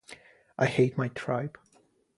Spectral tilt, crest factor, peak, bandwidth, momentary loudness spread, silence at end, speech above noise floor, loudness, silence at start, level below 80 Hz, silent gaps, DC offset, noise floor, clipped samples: -7 dB/octave; 20 dB; -12 dBFS; 11.5 kHz; 23 LU; 0.7 s; 38 dB; -29 LUFS; 0.1 s; -66 dBFS; none; under 0.1%; -66 dBFS; under 0.1%